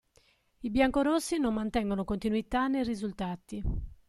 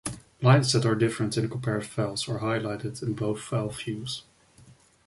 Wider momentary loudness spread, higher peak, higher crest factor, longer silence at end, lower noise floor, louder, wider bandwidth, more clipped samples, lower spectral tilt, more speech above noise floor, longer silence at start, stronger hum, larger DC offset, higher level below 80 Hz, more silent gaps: about the same, 11 LU vs 13 LU; second, -12 dBFS vs -8 dBFS; about the same, 18 dB vs 20 dB; second, 0.15 s vs 0.85 s; first, -67 dBFS vs -56 dBFS; second, -31 LUFS vs -27 LUFS; first, 13 kHz vs 11.5 kHz; neither; about the same, -5.5 dB/octave vs -5.5 dB/octave; first, 37 dB vs 29 dB; first, 0.6 s vs 0.05 s; neither; neither; first, -44 dBFS vs -58 dBFS; neither